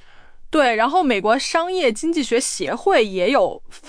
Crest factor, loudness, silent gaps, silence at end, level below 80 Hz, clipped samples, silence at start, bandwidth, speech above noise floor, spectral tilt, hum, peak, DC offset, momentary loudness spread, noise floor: 14 dB; -19 LUFS; none; 0 s; -48 dBFS; under 0.1%; 0.15 s; 10.5 kHz; 21 dB; -3 dB/octave; none; -6 dBFS; under 0.1%; 5 LU; -39 dBFS